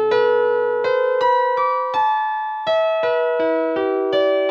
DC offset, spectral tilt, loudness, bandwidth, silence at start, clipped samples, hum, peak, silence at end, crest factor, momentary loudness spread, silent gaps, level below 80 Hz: under 0.1%; -5 dB/octave; -19 LUFS; 6.8 kHz; 0 s; under 0.1%; none; -6 dBFS; 0 s; 12 dB; 3 LU; none; -70 dBFS